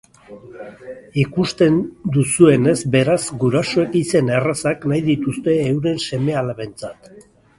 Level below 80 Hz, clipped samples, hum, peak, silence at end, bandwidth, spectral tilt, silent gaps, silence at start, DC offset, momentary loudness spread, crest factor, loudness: -50 dBFS; under 0.1%; none; 0 dBFS; 0.4 s; 11.5 kHz; -6 dB/octave; none; 0.3 s; under 0.1%; 18 LU; 18 dB; -18 LUFS